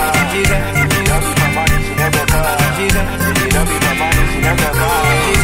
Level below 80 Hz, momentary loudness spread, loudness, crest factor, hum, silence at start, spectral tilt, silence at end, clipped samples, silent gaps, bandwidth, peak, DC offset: -20 dBFS; 2 LU; -14 LUFS; 14 dB; none; 0 s; -4 dB/octave; 0 s; under 0.1%; none; 16.5 kHz; 0 dBFS; 0.6%